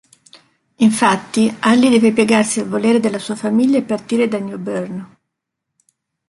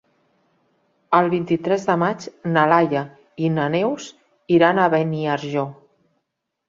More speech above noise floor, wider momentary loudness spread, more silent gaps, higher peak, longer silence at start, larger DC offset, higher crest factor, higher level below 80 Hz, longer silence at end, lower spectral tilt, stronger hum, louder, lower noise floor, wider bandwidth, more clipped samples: first, 63 dB vs 59 dB; about the same, 11 LU vs 11 LU; neither; about the same, 0 dBFS vs -2 dBFS; second, 0.8 s vs 1.1 s; neither; about the same, 16 dB vs 20 dB; about the same, -60 dBFS vs -62 dBFS; first, 1.25 s vs 0.95 s; second, -4.5 dB/octave vs -7 dB/octave; neither; first, -16 LUFS vs -20 LUFS; about the same, -78 dBFS vs -78 dBFS; first, 11.5 kHz vs 7.6 kHz; neither